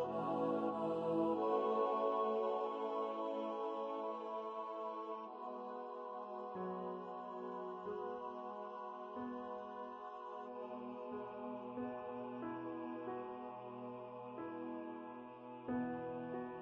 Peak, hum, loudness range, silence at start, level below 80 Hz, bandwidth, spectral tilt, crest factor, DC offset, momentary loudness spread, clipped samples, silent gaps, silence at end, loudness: -26 dBFS; none; 9 LU; 0 s; -82 dBFS; 7.8 kHz; -8 dB/octave; 18 dB; under 0.1%; 12 LU; under 0.1%; none; 0 s; -43 LUFS